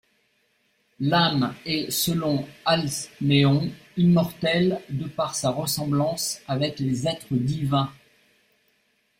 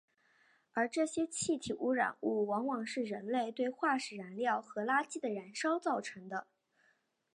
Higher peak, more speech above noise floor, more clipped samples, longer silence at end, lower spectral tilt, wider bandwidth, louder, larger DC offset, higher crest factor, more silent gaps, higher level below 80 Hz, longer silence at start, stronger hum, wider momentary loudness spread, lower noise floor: first, -6 dBFS vs -18 dBFS; first, 44 dB vs 40 dB; neither; first, 1.25 s vs 0.95 s; first, -5 dB/octave vs -3.5 dB/octave; first, 16 kHz vs 11 kHz; first, -24 LUFS vs -36 LUFS; neither; about the same, 18 dB vs 20 dB; neither; first, -58 dBFS vs -80 dBFS; first, 1 s vs 0.75 s; neither; about the same, 8 LU vs 6 LU; second, -68 dBFS vs -75 dBFS